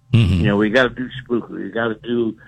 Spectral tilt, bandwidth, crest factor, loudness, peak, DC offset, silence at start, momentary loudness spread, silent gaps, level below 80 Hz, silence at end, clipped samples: -7.5 dB/octave; 9 kHz; 16 dB; -19 LUFS; -2 dBFS; under 0.1%; 0.1 s; 9 LU; none; -38 dBFS; 0.15 s; under 0.1%